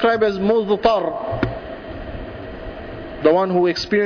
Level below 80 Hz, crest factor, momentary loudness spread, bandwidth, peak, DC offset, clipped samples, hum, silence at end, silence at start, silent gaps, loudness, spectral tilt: -40 dBFS; 16 dB; 16 LU; 5.4 kHz; -4 dBFS; under 0.1%; under 0.1%; none; 0 s; 0 s; none; -18 LUFS; -6.5 dB/octave